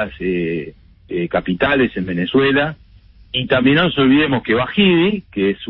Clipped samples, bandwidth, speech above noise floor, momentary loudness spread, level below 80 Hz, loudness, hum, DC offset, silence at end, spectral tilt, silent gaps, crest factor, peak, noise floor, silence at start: under 0.1%; 5.2 kHz; 29 dB; 10 LU; -44 dBFS; -16 LUFS; none; under 0.1%; 0 s; -11.5 dB/octave; none; 14 dB; -2 dBFS; -45 dBFS; 0 s